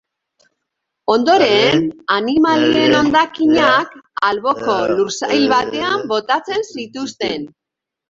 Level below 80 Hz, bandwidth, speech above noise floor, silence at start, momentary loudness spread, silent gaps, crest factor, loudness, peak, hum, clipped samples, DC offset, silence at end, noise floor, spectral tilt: -54 dBFS; 7.8 kHz; 68 dB; 1.1 s; 12 LU; none; 14 dB; -15 LUFS; -2 dBFS; none; under 0.1%; under 0.1%; 0.6 s; -83 dBFS; -4 dB/octave